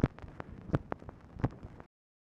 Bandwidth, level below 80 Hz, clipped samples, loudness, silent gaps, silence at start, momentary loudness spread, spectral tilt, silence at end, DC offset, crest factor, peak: 7.8 kHz; -48 dBFS; under 0.1%; -39 LUFS; none; 0.05 s; 16 LU; -9.5 dB/octave; 0.55 s; under 0.1%; 26 dB; -12 dBFS